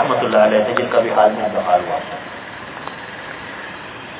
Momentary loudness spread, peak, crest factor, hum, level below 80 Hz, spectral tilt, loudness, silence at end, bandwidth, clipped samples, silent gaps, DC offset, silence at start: 17 LU; 0 dBFS; 18 dB; none; -56 dBFS; -9 dB/octave; -16 LUFS; 0 s; 4 kHz; under 0.1%; none; under 0.1%; 0 s